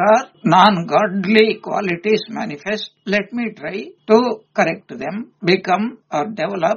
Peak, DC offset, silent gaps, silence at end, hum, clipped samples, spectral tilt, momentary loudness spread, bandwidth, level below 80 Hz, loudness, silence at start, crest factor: 0 dBFS; under 0.1%; none; 0 s; none; under 0.1%; -3.5 dB/octave; 13 LU; 7.2 kHz; -62 dBFS; -18 LUFS; 0 s; 18 dB